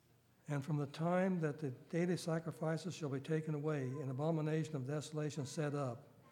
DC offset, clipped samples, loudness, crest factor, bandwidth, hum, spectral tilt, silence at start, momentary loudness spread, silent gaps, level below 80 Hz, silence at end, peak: under 0.1%; under 0.1%; -40 LUFS; 16 dB; 14.5 kHz; none; -7 dB/octave; 0.5 s; 6 LU; none; -84 dBFS; 0 s; -24 dBFS